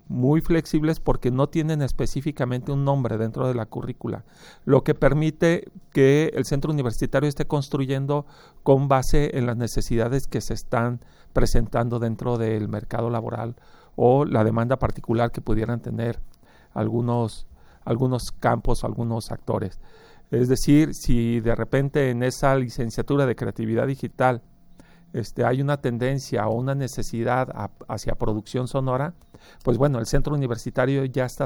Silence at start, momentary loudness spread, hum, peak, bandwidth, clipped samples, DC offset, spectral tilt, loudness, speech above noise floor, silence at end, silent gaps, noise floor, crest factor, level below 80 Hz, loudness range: 0.1 s; 10 LU; none; -4 dBFS; over 20 kHz; under 0.1%; under 0.1%; -7 dB/octave; -24 LUFS; 27 dB; 0 s; none; -49 dBFS; 18 dB; -32 dBFS; 4 LU